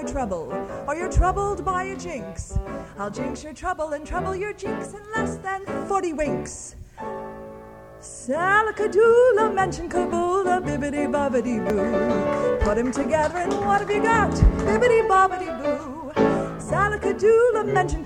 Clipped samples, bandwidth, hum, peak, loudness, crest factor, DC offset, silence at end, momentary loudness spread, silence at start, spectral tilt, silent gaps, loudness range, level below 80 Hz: under 0.1%; 11.5 kHz; none; -4 dBFS; -23 LUFS; 20 dB; under 0.1%; 0 s; 14 LU; 0 s; -6 dB/octave; none; 8 LU; -34 dBFS